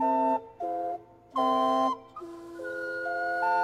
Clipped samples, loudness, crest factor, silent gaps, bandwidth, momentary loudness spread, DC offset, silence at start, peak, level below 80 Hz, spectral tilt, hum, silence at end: under 0.1%; -29 LUFS; 14 dB; none; 14 kHz; 15 LU; under 0.1%; 0 s; -14 dBFS; -70 dBFS; -4.5 dB/octave; none; 0 s